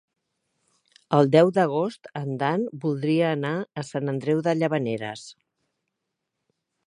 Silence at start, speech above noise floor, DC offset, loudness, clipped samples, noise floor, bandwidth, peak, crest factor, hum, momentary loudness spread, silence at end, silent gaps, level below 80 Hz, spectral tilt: 1.1 s; 58 dB; under 0.1%; -24 LUFS; under 0.1%; -82 dBFS; 11 kHz; -4 dBFS; 22 dB; none; 13 LU; 1.55 s; none; -72 dBFS; -7 dB/octave